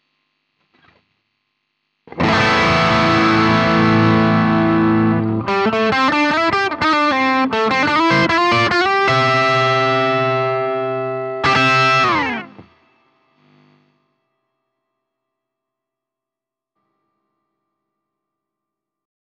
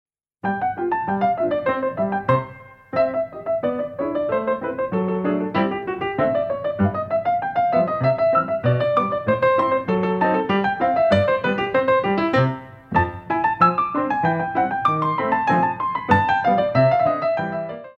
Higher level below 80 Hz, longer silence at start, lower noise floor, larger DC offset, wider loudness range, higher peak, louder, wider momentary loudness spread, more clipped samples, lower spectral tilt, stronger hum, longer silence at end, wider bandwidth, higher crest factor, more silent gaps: about the same, -48 dBFS vs -52 dBFS; first, 2.1 s vs 0.45 s; first, -86 dBFS vs -40 dBFS; neither; about the same, 4 LU vs 4 LU; about the same, -4 dBFS vs -2 dBFS; first, -15 LUFS vs -21 LUFS; about the same, 6 LU vs 7 LU; neither; second, -5.5 dB/octave vs -8.5 dB/octave; neither; first, 6.7 s vs 0.05 s; first, 9.2 kHz vs 7 kHz; about the same, 14 dB vs 18 dB; neither